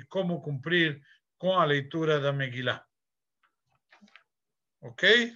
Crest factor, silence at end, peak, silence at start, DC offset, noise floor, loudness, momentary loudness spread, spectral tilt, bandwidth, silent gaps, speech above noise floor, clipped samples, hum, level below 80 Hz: 22 dB; 0 s; -8 dBFS; 0.1 s; under 0.1%; under -90 dBFS; -27 LUFS; 11 LU; -5.5 dB/octave; 7.6 kHz; none; over 63 dB; under 0.1%; none; -78 dBFS